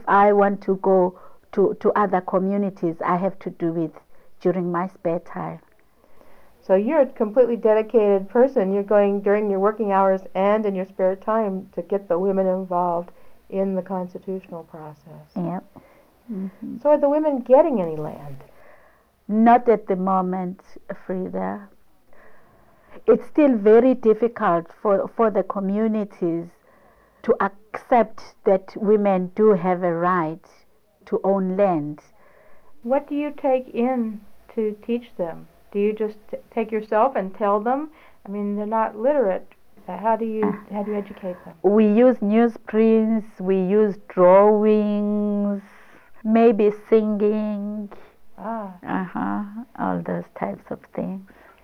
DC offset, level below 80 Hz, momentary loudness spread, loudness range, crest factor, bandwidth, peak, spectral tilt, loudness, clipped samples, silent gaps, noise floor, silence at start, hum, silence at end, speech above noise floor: under 0.1%; -60 dBFS; 15 LU; 8 LU; 18 dB; 6 kHz; -4 dBFS; -9.5 dB/octave; -21 LUFS; under 0.1%; none; -58 dBFS; 0 s; none; 0.4 s; 37 dB